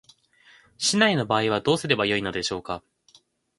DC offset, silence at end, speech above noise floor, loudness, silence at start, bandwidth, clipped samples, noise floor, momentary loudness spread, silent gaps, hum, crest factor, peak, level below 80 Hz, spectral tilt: under 0.1%; 0.8 s; 36 dB; -23 LUFS; 0.8 s; 11.5 kHz; under 0.1%; -59 dBFS; 11 LU; none; none; 22 dB; -4 dBFS; -58 dBFS; -3.5 dB/octave